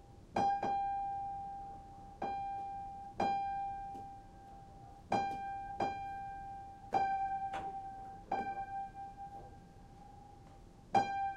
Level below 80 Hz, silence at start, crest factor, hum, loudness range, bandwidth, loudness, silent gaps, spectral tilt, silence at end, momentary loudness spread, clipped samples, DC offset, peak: -60 dBFS; 0 s; 22 dB; none; 3 LU; 9.8 kHz; -40 LUFS; none; -5.5 dB/octave; 0 s; 21 LU; under 0.1%; under 0.1%; -18 dBFS